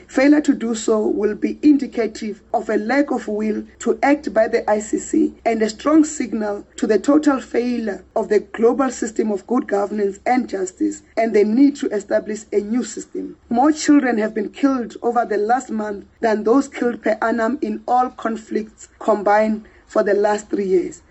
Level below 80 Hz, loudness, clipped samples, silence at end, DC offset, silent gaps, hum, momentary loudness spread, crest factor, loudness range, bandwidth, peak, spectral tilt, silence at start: -54 dBFS; -19 LUFS; under 0.1%; 0.15 s; under 0.1%; none; none; 9 LU; 14 dB; 2 LU; 8.4 kHz; -4 dBFS; -5 dB/octave; 0.1 s